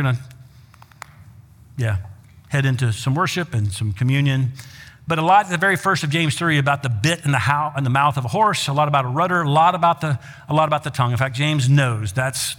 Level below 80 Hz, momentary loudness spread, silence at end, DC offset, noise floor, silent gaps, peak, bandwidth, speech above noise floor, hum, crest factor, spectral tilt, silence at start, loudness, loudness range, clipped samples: -52 dBFS; 9 LU; 0 s; under 0.1%; -47 dBFS; none; -2 dBFS; 17 kHz; 28 dB; none; 18 dB; -5 dB/octave; 0 s; -19 LUFS; 5 LU; under 0.1%